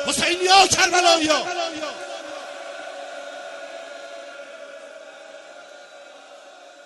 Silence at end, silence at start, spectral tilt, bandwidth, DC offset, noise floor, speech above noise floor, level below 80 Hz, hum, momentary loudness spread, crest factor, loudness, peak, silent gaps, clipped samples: 0.05 s; 0 s; -1 dB/octave; 11.5 kHz; under 0.1%; -45 dBFS; 27 dB; -58 dBFS; none; 26 LU; 20 dB; -17 LUFS; -4 dBFS; none; under 0.1%